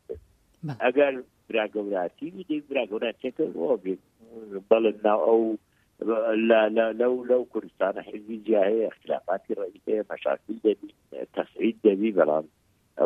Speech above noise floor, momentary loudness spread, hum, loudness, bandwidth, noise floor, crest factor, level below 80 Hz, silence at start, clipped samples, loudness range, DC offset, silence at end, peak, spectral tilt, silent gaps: 24 dB; 16 LU; none; -26 LUFS; 4.1 kHz; -50 dBFS; 22 dB; -68 dBFS; 0.1 s; under 0.1%; 5 LU; under 0.1%; 0 s; -4 dBFS; -8 dB/octave; none